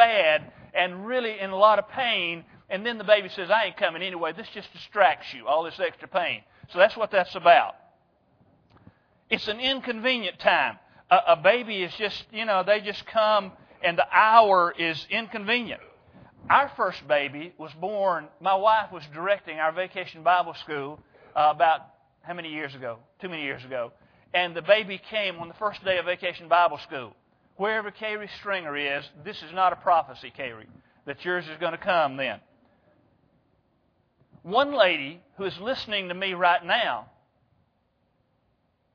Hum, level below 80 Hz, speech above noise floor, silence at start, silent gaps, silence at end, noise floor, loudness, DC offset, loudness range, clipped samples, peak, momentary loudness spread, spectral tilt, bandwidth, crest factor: none; -68 dBFS; 45 dB; 0 s; none; 1.9 s; -70 dBFS; -25 LUFS; under 0.1%; 6 LU; under 0.1%; -2 dBFS; 15 LU; -5.5 dB/octave; 5.4 kHz; 24 dB